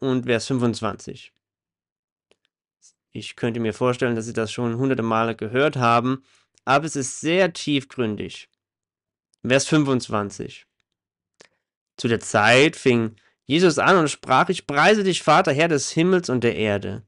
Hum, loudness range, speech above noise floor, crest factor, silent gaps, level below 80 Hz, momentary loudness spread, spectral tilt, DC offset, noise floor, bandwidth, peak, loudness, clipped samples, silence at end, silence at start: none; 9 LU; over 69 dB; 16 dB; 1.92-2.16 s, 11.77-11.86 s; -60 dBFS; 14 LU; -5 dB/octave; under 0.1%; under -90 dBFS; 11.5 kHz; -6 dBFS; -20 LUFS; under 0.1%; 0.05 s; 0 s